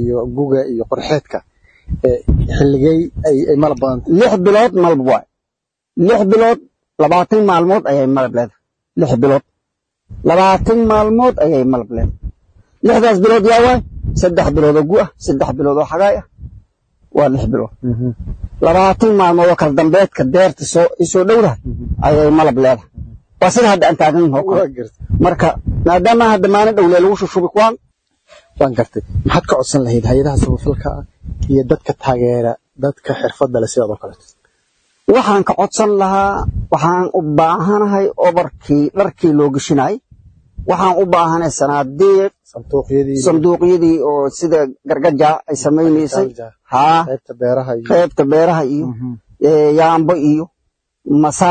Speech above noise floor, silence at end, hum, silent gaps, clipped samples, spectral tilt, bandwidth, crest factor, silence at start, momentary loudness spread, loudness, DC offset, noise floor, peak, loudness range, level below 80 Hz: 67 dB; 0 s; none; none; under 0.1%; -6.5 dB/octave; 9.4 kHz; 12 dB; 0 s; 10 LU; -13 LUFS; under 0.1%; -79 dBFS; 0 dBFS; 4 LU; -32 dBFS